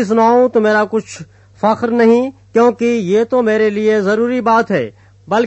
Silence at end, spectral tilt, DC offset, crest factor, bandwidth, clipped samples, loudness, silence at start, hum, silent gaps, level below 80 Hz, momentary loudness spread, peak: 0 s; -6 dB/octave; under 0.1%; 12 dB; 8.4 kHz; under 0.1%; -14 LUFS; 0 s; none; none; -58 dBFS; 8 LU; 0 dBFS